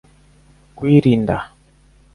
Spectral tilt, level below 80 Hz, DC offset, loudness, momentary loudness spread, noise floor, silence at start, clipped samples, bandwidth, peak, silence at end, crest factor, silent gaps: -9 dB/octave; -44 dBFS; under 0.1%; -16 LUFS; 13 LU; -52 dBFS; 0.8 s; under 0.1%; 11 kHz; 0 dBFS; 0.7 s; 18 dB; none